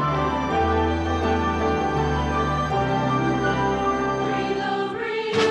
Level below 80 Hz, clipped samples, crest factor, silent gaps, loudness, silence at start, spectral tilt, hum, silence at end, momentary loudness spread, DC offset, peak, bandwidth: -38 dBFS; under 0.1%; 14 dB; none; -23 LUFS; 0 s; -6 dB/octave; none; 0 s; 3 LU; under 0.1%; -10 dBFS; 10 kHz